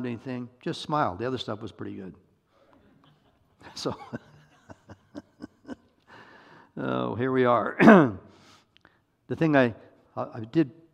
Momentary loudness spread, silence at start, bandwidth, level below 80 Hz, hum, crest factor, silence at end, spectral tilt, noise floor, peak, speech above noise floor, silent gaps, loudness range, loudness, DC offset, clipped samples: 27 LU; 0 s; 9.8 kHz; -66 dBFS; none; 28 dB; 0.25 s; -7 dB/octave; -64 dBFS; 0 dBFS; 39 dB; none; 19 LU; -25 LUFS; under 0.1%; under 0.1%